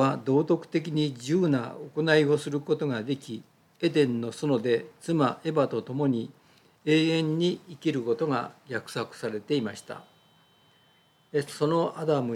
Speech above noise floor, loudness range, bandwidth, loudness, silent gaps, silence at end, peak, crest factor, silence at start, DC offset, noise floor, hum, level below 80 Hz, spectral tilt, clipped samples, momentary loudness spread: 36 dB; 5 LU; 13.5 kHz; -27 LUFS; none; 0 s; -8 dBFS; 20 dB; 0 s; under 0.1%; -63 dBFS; none; -80 dBFS; -6.5 dB/octave; under 0.1%; 11 LU